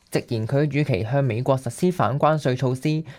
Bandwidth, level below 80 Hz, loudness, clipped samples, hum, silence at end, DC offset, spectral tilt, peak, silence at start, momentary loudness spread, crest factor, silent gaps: 15.5 kHz; -56 dBFS; -22 LUFS; under 0.1%; none; 0 s; under 0.1%; -7 dB/octave; -6 dBFS; 0.1 s; 4 LU; 16 dB; none